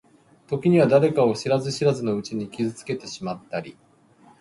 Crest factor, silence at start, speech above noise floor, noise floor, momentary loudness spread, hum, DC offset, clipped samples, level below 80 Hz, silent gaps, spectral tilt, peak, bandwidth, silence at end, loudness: 18 dB; 0.5 s; 32 dB; -55 dBFS; 15 LU; none; under 0.1%; under 0.1%; -62 dBFS; none; -6.5 dB/octave; -6 dBFS; 11.5 kHz; 0.7 s; -23 LUFS